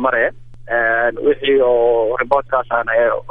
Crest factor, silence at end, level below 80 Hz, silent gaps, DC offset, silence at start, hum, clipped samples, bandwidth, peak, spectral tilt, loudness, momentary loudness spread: 14 dB; 0 s; -44 dBFS; none; under 0.1%; 0 s; none; under 0.1%; 4.3 kHz; 0 dBFS; -7 dB/octave; -16 LUFS; 4 LU